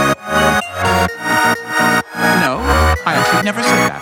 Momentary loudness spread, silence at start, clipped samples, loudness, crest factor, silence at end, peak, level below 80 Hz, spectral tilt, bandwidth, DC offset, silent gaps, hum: 2 LU; 0 s; under 0.1%; -14 LUFS; 14 dB; 0 s; 0 dBFS; -28 dBFS; -4 dB/octave; 17 kHz; under 0.1%; none; none